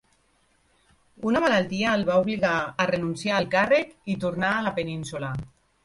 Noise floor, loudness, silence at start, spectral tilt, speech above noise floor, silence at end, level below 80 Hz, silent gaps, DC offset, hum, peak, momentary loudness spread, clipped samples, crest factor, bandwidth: -65 dBFS; -25 LUFS; 1.2 s; -5.5 dB/octave; 41 dB; 0.35 s; -56 dBFS; none; under 0.1%; none; -8 dBFS; 10 LU; under 0.1%; 18 dB; 11.5 kHz